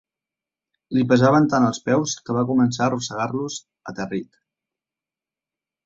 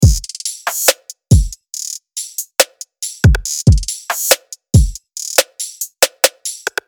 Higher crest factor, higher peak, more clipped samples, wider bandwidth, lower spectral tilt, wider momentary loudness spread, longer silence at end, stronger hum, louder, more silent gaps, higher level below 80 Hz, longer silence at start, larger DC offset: about the same, 20 dB vs 16 dB; about the same, -2 dBFS vs 0 dBFS; second, under 0.1% vs 0.3%; second, 7.8 kHz vs over 20 kHz; first, -5.5 dB/octave vs -3.5 dB/octave; first, 15 LU vs 11 LU; first, 1.6 s vs 0.2 s; neither; second, -21 LUFS vs -16 LUFS; neither; second, -60 dBFS vs -22 dBFS; first, 0.9 s vs 0 s; neither